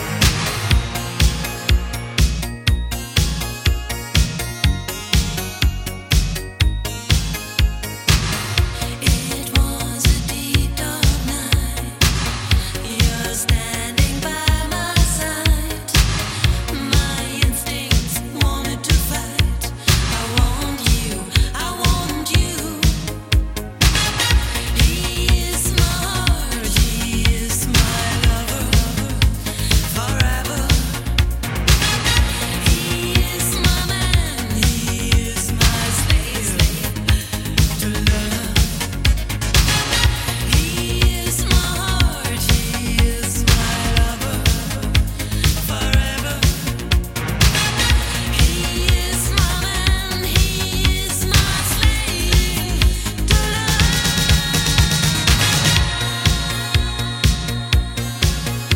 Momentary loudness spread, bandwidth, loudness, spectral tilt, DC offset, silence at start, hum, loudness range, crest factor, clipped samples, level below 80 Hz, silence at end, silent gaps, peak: 5 LU; 17 kHz; -18 LUFS; -3.5 dB/octave; under 0.1%; 0 s; none; 3 LU; 18 dB; under 0.1%; -22 dBFS; 0 s; none; 0 dBFS